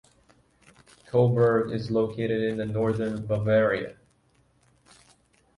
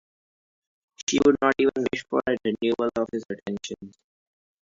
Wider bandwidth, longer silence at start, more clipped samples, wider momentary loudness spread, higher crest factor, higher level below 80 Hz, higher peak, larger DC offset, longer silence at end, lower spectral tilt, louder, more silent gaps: first, 11.5 kHz vs 7.6 kHz; first, 1.15 s vs 1 s; neither; second, 7 LU vs 13 LU; about the same, 18 dB vs 20 dB; about the same, -58 dBFS vs -60 dBFS; second, -10 dBFS vs -6 dBFS; neither; first, 1.65 s vs 0.8 s; first, -8.5 dB/octave vs -4 dB/octave; about the same, -25 LUFS vs -25 LUFS; second, none vs 1.03-1.07 s